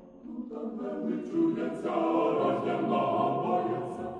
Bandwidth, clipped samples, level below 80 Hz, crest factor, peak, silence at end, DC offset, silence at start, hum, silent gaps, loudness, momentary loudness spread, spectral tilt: 9.8 kHz; under 0.1%; -70 dBFS; 16 dB; -14 dBFS; 0 s; under 0.1%; 0 s; none; none; -30 LUFS; 11 LU; -8 dB/octave